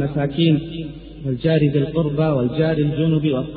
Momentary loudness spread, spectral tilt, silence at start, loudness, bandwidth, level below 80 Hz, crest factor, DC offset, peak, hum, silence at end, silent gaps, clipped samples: 12 LU; -7 dB/octave; 0 s; -19 LUFS; 4.7 kHz; -42 dBFS; 14 dB; under 0.1%; -6 dBFS; none; 0 s; none; under 0.1%